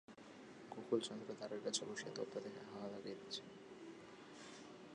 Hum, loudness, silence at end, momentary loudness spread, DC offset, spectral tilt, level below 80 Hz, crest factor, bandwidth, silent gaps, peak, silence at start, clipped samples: none; -48 LUFS; 0 s; 16 LU; under 0.1%; -3.5 dB/octave; -86 dBFS; 24 dB; 10.5 kHz; none; -24 dBFS; 0.1 s; under 0.1%